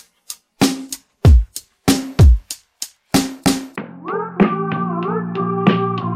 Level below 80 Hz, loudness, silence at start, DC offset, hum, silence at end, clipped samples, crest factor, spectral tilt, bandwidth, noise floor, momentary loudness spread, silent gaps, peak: -22 dBFS; -17 LUFS; 0.3 s; under 0.1%; none; 0 s; under 0.1%; 16 dB; -5.5 dB/octave; 16 kHz; -38 dBFS; 18 LU; none; 0 dBFS